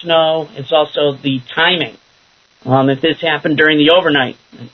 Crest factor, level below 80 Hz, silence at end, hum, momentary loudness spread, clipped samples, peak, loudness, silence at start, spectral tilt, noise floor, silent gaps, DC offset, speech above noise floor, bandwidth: 14 dB; -58 dBFS; 0.05 s; none; 10 LU; under 0.1%; 0 dBFS; -13 LUFS; 0 s; -7 dB/octave; -52 dBFS; none; under 0.1%; 39 dB; 6.4 kHz